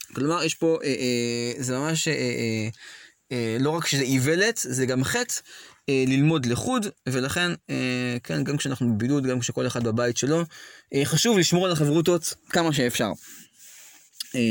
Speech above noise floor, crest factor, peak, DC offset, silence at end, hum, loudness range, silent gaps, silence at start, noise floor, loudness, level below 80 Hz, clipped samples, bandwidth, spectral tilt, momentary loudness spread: 25 dB; 16 dB; -8 dBFS; under 0.1%; 0 s; none; 3 LU; none; 0 s; -50 dBFS; -24 LUFS; -60 dBFS; under 0.1%; 17 kHz; -4.5 dB/octave; 10 LU